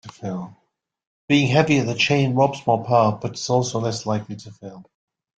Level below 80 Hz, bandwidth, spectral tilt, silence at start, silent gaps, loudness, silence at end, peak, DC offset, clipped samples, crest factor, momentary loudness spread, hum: -58 dBFS; 9 kHz; -5.5 dB/octave; 0.05 s; 1.07-1.28 s; -20 LUFS; 0.55 s; -2 dBFS; under 0.1%; under 0.1%; 18 dB; 19 LU; none